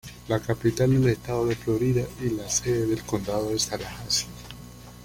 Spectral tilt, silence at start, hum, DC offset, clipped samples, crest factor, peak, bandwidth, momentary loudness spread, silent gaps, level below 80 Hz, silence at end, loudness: -5 dB/octave; 0.05 s; 60 Hz at -40 dBFS; under 0.1%; under 0.1%; 16 dB; -10 dBFS; 16.5 kHz; 13 LU; none; -46 dBFS; 0 s; -26 LUFS